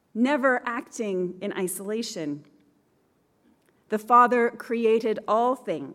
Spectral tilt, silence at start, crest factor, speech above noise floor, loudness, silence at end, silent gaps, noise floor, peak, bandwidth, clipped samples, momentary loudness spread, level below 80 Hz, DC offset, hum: -4.5 dB/octave; 0.15 s; 20 dB; 42 dB; -25 LUFS; 0 s; none; -67 dBFS; -6 dBFS; 15.5 kHz; under 0.1%; 13 LU; -78 dBFS; under 0.1%; none